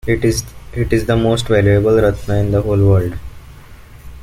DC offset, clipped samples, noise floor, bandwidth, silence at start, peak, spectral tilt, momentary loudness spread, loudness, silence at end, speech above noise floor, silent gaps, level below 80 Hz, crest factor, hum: under 0.1%; under 0.1%; -37 dBFS; 15 kHz; 0.05 s; -2 dBFS; -6.5 dB/octave; 11 LU; -15 LUFS; 0 s; 23 dB; none; -30 dBFS; 14 dB; none